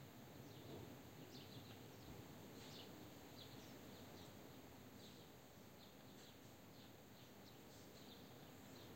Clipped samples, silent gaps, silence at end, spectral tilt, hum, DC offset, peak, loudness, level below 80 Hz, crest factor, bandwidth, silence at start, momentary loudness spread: under 0.1%; none; 0 s; -4.5 dB/octave; none; under 0.1%; -42 dBFS; -60 LUFS; -78 dBFS; 16 dB; 16 kHz; 0 s; 5 LU